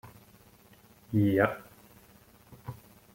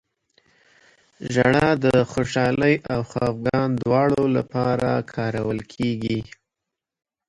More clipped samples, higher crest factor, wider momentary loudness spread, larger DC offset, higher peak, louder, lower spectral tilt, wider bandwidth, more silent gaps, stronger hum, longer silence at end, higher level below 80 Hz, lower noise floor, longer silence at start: neither; first, 24 dB vs 18 dB; first, 22 LU vs 9 LU; neither; second, -10 dBFS vs -4 dBFS; second, -28 LUFS vs -22 LUFS; about the same, -8 dB/octave vs -7 dB/octave; first, 16.5 kHz vs 11.5 kHz; neither; neither; second, 0.4 s vs 1.05 s; second, -64 dBFS vs -48 dBFS; second, -58 dBFS vs -85 dBFS; second, 0.05 s vs 1.2 s